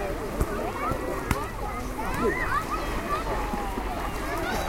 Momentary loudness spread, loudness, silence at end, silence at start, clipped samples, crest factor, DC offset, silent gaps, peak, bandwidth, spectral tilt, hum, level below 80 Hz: 5 LU; -29 LUFS; 0 s; 0 s; under 0.1%; 24 dB; under 0.1%; none; -6 dBFS; 16.5 kHz; -5 dB/octave; none; -34 dBFS